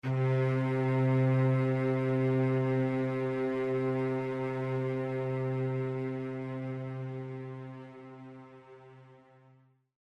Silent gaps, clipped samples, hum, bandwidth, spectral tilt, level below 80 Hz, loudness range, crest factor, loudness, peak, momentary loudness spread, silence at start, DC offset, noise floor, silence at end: none; under 0.1%; none; 5.4 kHz; -9.5 dB/octave; -70 dBFS; 13 LU; 14 dB; -31 LUFS; -18 dBFS; 16 LU; 0.05 s; under 0.1%; -64 dBFS; 0.95 s